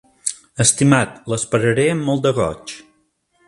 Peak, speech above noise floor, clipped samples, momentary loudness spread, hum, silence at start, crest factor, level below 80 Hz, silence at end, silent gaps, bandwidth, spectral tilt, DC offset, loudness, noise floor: 0 dBFS; 46 dB; under 0.1%; 13 LU; none; 0.25 s; 18 dB; -48 dBFS; 0.65 s; none; 11.5 kHz; -4.5 dB/octave; under 0.1%; -17 LUFS; -63 dBFS